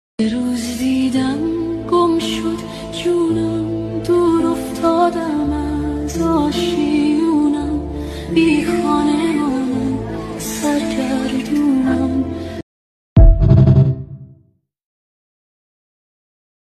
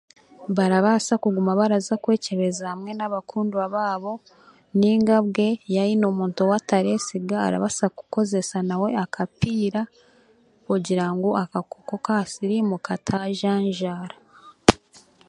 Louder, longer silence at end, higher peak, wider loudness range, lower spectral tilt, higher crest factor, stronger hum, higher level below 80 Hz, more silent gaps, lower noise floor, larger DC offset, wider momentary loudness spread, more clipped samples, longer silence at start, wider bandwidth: first, -17 LUFS vs -23 LUFS; first, 2.45 s vs 0.55 s; about the same, 0 dBFS vs 0 dBFS; about the same, 3 LU vs 4 LU; first, -7 dB/octave vs -5.5 dB/octave; second, 16 dB vs 22 dB; neither; first, -24 dBFS vs -52 dBFS; first, 12.63-13.16 s vs none; about the same, -56 dBFS vs -58 dBFS; neither; about the same, 11 LU vs 10 LU; neither; second, 0.2 s vs 0.4 s; first, 14 kHz vs 11 kHz